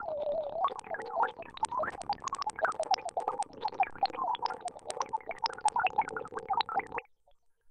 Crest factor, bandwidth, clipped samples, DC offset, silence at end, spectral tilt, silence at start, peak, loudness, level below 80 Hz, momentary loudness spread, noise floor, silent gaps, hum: 18 dB; 10 kHz; under 0.1%; under 0.1%; 0.7 s; -2 dB/octave; 0 s; -16 dBFS; -34 LUFS; -68 dBFS; 7 LU; -66 dBFS; none; none